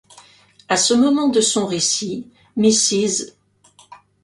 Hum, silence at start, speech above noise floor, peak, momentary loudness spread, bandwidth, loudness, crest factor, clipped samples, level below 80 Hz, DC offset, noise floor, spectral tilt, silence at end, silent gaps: 50 Hz at -45 dBFS; 0.7 s; 36 dB; -2 dBFS; 14 LU; 11.5 kHz; -17 LUFS; 18 dB; under 0.1%; -62 dBFS; under 0.1%; -53 dBFS; -2.5 dB/octave; 0.3 s; none